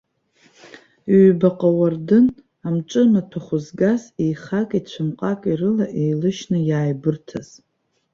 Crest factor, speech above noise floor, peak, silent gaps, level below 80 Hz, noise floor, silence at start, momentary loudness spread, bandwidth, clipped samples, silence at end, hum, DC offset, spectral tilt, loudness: 18 dB; 40 dB; -2 dBFS; none; -60 dBFS; -58 dBFS; 1.05 s; 11 LU; 7.4 kHz; under 0.1%; 0.7 s; none; under 0.1%; -8 dB/octave; -19 LUFS